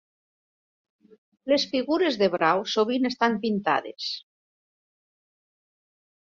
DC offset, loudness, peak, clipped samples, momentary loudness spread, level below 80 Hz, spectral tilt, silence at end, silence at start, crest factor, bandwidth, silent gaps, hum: under 0.1%; -24 LUFS; -8 dBFS; under 0.1%; 10 LU; -70 dBFS; -4.5 dB/octave; 2 s; 1.45 s; 20 dB; 7.6 kHz; none; none